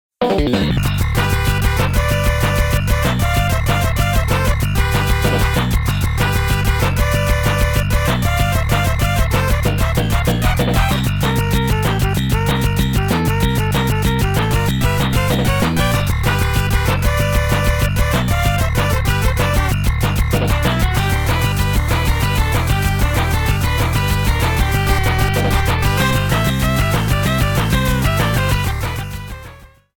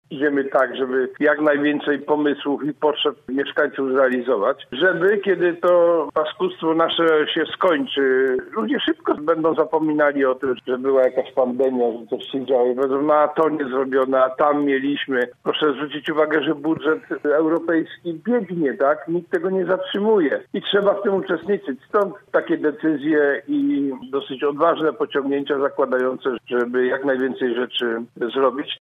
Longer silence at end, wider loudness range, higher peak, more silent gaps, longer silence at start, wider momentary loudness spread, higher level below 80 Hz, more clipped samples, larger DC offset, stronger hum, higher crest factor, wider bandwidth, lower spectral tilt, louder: first, 0.35 s vs 0.05 s; about the same, 1 LU vs 3 LU; first, 0 dBFS vs -4 dBFS; neither; about the same, 0.2 s vs 0.1 s; second, 1 LU vs 6 LU; first, -20 dBFS vs -68 dBFS; neither; neither; neither; about the same, 14 dB vs 16 dB; first, 18 kHz vs 4.5 kHz; second, -5 dB/octave vs -7 dB/octave; first, -17 LUFS vs -20 LUFS